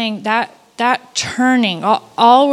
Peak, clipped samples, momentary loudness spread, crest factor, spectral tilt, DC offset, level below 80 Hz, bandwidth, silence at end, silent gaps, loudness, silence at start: 0 dBFS; under 0.1%; 8 LU; 14 dB; -3.5 dB/octave; under 0.1%; -60 dBFS; 12.5 kHz; 0 s; none; -15 LUFS; 0 s